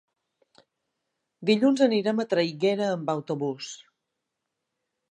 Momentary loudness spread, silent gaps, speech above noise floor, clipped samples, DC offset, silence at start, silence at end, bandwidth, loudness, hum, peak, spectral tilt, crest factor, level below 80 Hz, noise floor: 13 LU; none; 58 dB; under 0.1%; under 0.1%; 1.4 s; 1.35 s; 10 kHz; -25 LUFS; none; -8 dBFS; -5.5 dB/octave; 20 dB; -80 dBFS; -83 dBFS